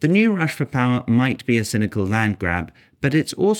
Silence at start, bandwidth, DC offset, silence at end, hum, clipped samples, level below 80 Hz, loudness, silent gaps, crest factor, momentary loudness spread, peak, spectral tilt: 0 s; 17.5 kHz; under 0.1%; 0 s; none; under 0.1%; -54 dBFS; -20 LUFS; none; 16 dB; 6 LU; -4 dBFS; -6.5 dB/octave